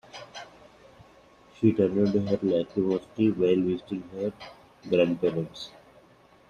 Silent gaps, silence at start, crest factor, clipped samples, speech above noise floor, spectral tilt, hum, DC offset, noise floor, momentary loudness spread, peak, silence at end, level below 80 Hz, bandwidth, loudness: none; 0.15 s; 20 dB; under 0.1%; 31 dB; -8 dB/octave; none; under 0.1%; -57 dBFS; 19 LU; -8 dBFS; 0.8 s; -64 dBFS; 9.4 kHz; -26 LUFS